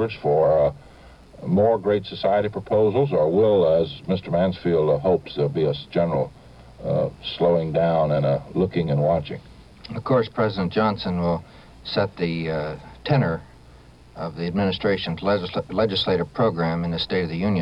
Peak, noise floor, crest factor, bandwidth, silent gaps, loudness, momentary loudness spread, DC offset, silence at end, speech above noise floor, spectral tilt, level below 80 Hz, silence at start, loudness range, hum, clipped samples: -6 dBFS; -48 dBFS; 16 dB; 7.6 kHz; none; -22 LUFS; 9 LU; under 0.1%; 0 s; 26 dB; -8.5 dB/octave; -48 dBFS; 0 s; 5 LU; none; under 0.1%